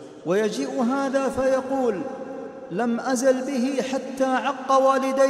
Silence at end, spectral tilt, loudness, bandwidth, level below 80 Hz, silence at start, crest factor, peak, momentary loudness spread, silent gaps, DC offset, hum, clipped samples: 0 s; -4.5 dB/octave; -23 LUFS; 13.5 kHz; -60 dBFS; 0 s; 16 dB; -6 dBFS; 11 LU; none; under 0.1%; none; under 0.1%